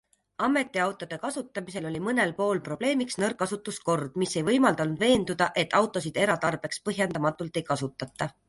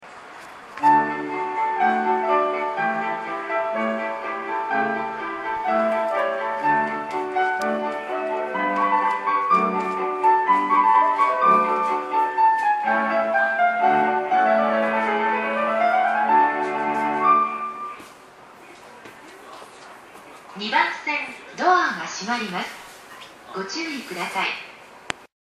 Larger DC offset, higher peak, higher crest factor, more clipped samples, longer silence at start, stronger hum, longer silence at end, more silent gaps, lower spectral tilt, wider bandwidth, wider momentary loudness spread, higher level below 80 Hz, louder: neither; second, -8 dBFS vs -2 dBFS; about the same, 20 dB vs 20 dB; neither; first, 0.4 s vs 0 s; neither; about the same, 0.2 s vs 0.2 s; neither; about the same, -4.5 dB/octave vs -4 dB/octave; second, 11.5 kHz vs 13.5 kHz; second, 10 LU vs 15 LU; first, -60 dBFS vs -70 dBFS; second, -27 LUFS vs -21 LUFS